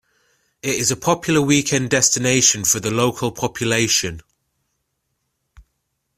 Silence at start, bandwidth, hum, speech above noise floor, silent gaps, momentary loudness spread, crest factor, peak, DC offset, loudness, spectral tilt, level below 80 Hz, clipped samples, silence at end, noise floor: 0.65 s; 16 kHz; none; 55 dB; none; 10 LU; 20 dB; 0 dBFS; under 0.1%; -17 LUFS; -3 dB/octave; -52 dBFS; under 0.1%; 2 s; -73 dBFS